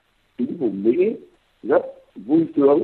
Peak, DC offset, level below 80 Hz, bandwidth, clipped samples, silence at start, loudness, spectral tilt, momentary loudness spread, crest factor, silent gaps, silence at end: -4 dBFS; under 0.1%; -66 dBFS; 4.3 kHz; under 0.1%; 0.4 s; -21 LUFS; -10.5 dB/octave; 19 LU; 16 dB; none; 0 s